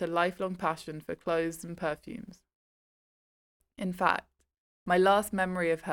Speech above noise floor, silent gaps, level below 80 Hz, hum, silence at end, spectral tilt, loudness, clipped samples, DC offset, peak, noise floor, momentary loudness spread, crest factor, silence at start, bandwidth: over 60 dB; 2.55-3.60 s, 4.58-4.86 s; -62 dBFS; none; 0 s; -5 dB/octave; -30 LUFS; under 0.1%; under 0.1%; -10 dBFS; under -90 dBFS; 15 LU; 22 dB; 0 s; 18 kHz